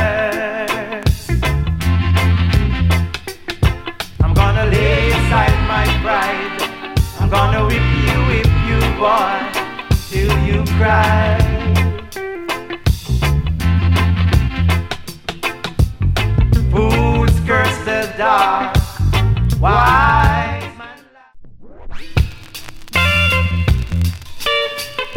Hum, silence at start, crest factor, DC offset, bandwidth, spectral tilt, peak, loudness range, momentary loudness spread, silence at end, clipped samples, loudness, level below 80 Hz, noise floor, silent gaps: none; 0 s; 14 dB; under 0.1%; 16.5 kHz; -6 dB/octave; 0 dBFS; 3 LU; 10 LU; 0 s; under 0.1%; -16 LUFS; -22 dBFS; -40 dBFS; none